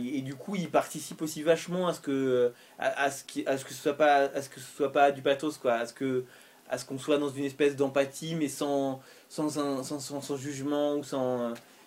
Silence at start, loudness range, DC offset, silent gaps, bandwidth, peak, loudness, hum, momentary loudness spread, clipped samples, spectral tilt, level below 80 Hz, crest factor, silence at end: 0 s; 4 LU; under 0.1%; none; 16 kHz; -10 dBFS; -30 LUFS; none; 11 LU; under 0.1%; -4.5 dB/octave; -76 dBFS; 20 dB; 0.25 s